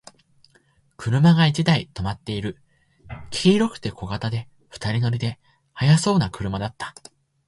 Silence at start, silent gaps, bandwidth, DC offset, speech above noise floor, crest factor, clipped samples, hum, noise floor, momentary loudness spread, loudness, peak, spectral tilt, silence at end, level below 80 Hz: 1 s; none; 11.5 kHz; under 0.1%; 40 dB; 20 dB; under 0.1%; none; -61 dBFS; 17 LU; -22 LUFS; -4 dBFS; -6 dB/octave; 0.55 s; -48 dBFS